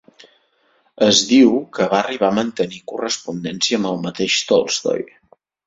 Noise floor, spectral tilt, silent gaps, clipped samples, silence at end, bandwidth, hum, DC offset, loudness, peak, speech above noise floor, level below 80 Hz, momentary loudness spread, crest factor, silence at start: -61 dBFS; -3.5 dB/octave; none; under 0.1%; 0.6 s; 8 kHz; none; under 0.1%; -18 LUFS; 0 dBFS; 43 dB; -60 dBFS; 12 LU; 18 dB; 1 s